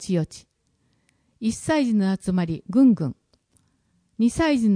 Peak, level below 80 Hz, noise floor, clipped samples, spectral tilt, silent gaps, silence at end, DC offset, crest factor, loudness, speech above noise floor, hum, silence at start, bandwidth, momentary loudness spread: -8 dBFS; -50 dBFS; -68 dBFS; under 0.1%; -6.5 dB/octave; none; 0 s; under 0.1%; 14 dB; -22 LUFS; 47 dB; none; 0 s; 10.5 kHz; 10 LU